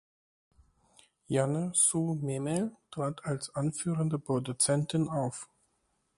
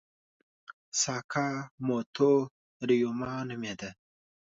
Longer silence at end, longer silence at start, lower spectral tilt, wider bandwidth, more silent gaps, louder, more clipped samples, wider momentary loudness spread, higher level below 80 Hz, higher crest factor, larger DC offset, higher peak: about the same, 0.7 s vs 0.65 s; first, 1.3 s vs 0.7 s; about the same, -5 dB/octave vs -4.5 dB/octave; first, 11.5 kHz vs 8 kHz; second, none vs 0.73-0.92 s, 1.24-1.29 s, 1.71-1.78 s, 2.06-2.13 s, 2.51-2.80 s; about the same, -31 LUFS vs -30 LUFS; neither; about the same, 11 LU vs 13 LU; about the same, -68 dBFS vs -70 dBFS; about the same, 18 dB vs 18 dB; neither; about the same, -14 dBFS vs -14 dBFS